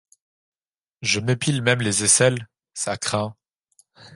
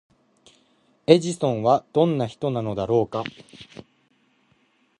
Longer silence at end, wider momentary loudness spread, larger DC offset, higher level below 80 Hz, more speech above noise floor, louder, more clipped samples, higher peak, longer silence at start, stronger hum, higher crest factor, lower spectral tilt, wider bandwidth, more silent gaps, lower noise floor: second, 0 s vs 1.35 s; second, 14 LU vs 24 LU; neither; about the same, -58 dBFS vs -58 dBFS; first, over 69 dB vs 42 dB; about the same, -21 LUFS vs -22 LUFS; neither; about the same, -2 dBFS vs -2 dBFS; about the same, 1 s vs 1.1 s; neither; about the same, 22 dB vs 24 dB; second, -3 dB/octave vs -6.5 dB/octave; about the same, 11.5 kHz vs 11 kHz; neither; first, under -90 dBFS vs -64 dBFS